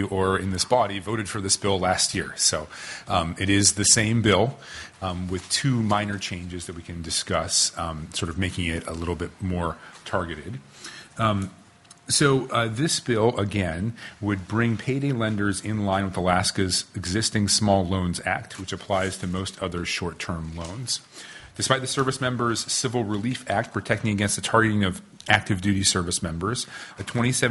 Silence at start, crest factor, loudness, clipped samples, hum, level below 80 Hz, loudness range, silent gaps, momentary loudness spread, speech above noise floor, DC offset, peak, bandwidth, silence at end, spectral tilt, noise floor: 0 s; 24 dB; -24 LUFS; under 0.1%; none; -52 dBFS; 7 LU; none; 13 LU; 26 dB; under 0.1%; -2 dBFS; 11.5 kHz; 0 s; -3.5 dB/octave; -51 dBFS